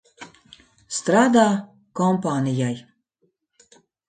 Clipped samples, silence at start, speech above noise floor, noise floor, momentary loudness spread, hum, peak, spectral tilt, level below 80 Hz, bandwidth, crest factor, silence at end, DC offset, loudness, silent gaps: under 0.1%; 0.2 s; 51 dB; -70 dBFS; 18 LU; none; -4 dBFS; -5.5 dB/octave; -66 dBFS; 9.4 kHz; 20 dB; 1.25 s; under 0.1%; -21 LUFS; none